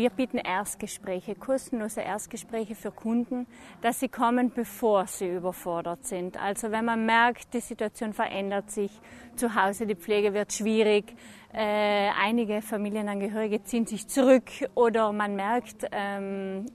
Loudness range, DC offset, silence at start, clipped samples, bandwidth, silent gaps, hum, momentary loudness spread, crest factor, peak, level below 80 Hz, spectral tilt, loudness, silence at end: 4 LU; under 0.1%; 0 s; under 0.1%; 13.5 kHz; none; none; 11 LU; 20 dB; -8 dBFS; -62 dBFS; -4 dB/octave; -28 LUFS; 0 s